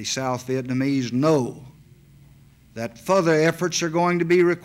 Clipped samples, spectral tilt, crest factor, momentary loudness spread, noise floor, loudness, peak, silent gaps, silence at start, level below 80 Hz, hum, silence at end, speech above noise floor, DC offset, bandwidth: under 0.1%; -5 dB/octave; 16 dB; 13 LU; -51 dBFS; -22 LUFS; -6 dBFS; none; 0 s; -60 dBFS; none; 0 s; 30 dB; under 0.1%; 15.5 kHz